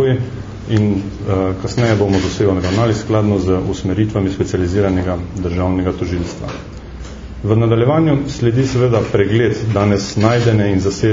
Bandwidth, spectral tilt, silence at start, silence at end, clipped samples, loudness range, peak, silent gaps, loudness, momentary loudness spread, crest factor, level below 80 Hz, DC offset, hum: 7.6 kHz; -7 dB/octave; 0 s; 0 s; under 0.1%; 4 LU; 0 dBFS; none; -16 LUFS; 11 LU; 16 dB; -34 dBFS; under 0.1%; none